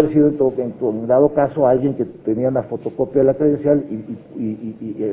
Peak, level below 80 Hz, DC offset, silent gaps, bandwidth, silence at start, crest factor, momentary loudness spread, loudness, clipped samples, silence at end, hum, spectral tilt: 0 dBFS; -50 dBFS; under 0.1%; none; 3.7 kHz; 0 s; 18 dB; 12 LU; -18 LUFS; under 0.1%; 0 s; none; -13 dB/octave